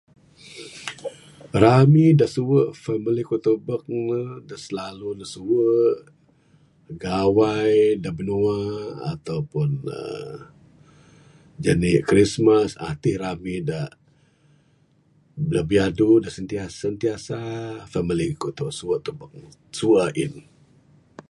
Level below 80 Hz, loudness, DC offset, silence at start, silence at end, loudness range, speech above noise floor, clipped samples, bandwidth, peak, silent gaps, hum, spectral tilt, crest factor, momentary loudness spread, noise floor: -50 dBFS; -22 LUFS; under 0.1%; 0.45 s; 0.9 s; 8 LU; 39 dB; under 0.1%; 11.5 kHz; 0 dBFS; none; none; -7 dB/octave; 22 dB; 17 LU; -60 dBFS